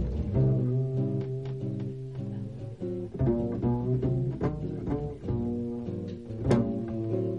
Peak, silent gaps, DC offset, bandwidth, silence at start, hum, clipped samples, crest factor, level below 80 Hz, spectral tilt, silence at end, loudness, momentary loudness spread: -12 dBFS; none; 0.1%; 6.8 kHz; 0 s; none; under 0.1%; 18 dB; -44 dBFS; -10 dB/octave; 0 s; -31 LUFS; 10 LU